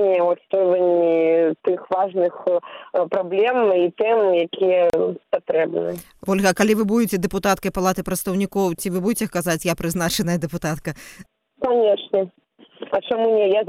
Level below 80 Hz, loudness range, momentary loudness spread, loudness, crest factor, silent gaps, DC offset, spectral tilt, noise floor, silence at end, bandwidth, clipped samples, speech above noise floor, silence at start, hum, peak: -50 dBFS; 4 LU; 9 LU; -20 LUFS; 18 dB; none; under 0.1%; -5 dB/octave; -40 dBFS; 0 s; 16 kHz; under 0.1%; 20 dB; 0 s; none; -2 dBFS